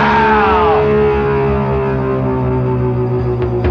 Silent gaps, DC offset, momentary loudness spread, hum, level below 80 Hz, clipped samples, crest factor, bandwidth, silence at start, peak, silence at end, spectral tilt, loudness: none; under 0.1%; 6 LU; none; -28 dBFS; under 0.1%; 10 dB; 6.4 kHz; 0 s; -2 dBFS; 0 s; -9 dB/octave; -14 LUFS